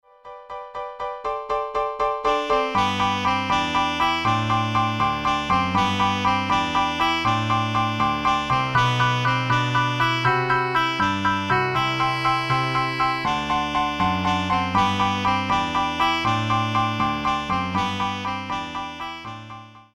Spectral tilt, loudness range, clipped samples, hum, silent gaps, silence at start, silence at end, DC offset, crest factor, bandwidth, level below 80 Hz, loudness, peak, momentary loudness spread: -5 dB/octave; 3 LU; under 0.1%; none; none; 0.25 s; 0.15 s; under 0.1%; 16 dB; 15 kHz; -46 dBFS; -22 LUFS; -6 dBFS; 8 LU